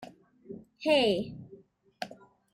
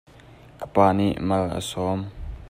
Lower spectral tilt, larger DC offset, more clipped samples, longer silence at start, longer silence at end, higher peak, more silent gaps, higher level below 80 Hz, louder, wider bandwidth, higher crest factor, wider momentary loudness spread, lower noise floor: second, -5 dB/octave vs -6.5 dB/octave; neither; neither; second, 0 s vs 0.3 s; first, 0.4 s vs 0.05 s; second, -14 dBFS vs -4 dBFS; neither; second, -68 dBFS vs -44 dBFS; second, -28 LUFS vs -23 LUFS; about the same, 16 kHz vs 15.5 kHz; about the same, 18 dB vs 20 dB; first, 23 LU vs 17 LU; first, -56 dBFS vs -48 dBFS